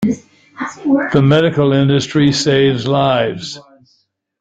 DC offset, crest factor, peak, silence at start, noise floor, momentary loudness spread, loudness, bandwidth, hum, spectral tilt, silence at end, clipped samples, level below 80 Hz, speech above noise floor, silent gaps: under 0.1%; 14 dB; 0 dBFS; 0 s; -61 dBFS; 15 LU; -14 LUFS; 8 kHz; none; -6 dB/octave; 0.8 s; under 0.1%; -48 dBFS; 48 dB; none